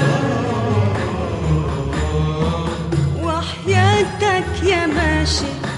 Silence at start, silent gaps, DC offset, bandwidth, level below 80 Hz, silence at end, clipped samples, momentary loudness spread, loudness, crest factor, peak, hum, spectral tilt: 0 s; none; under 0.1%; 11 kHz; -30 dBFS; 0 s; under 0.1%; 6 LU; -18 LUFS; 16 dB; -2 dBFS; none; -5.5 dB/octave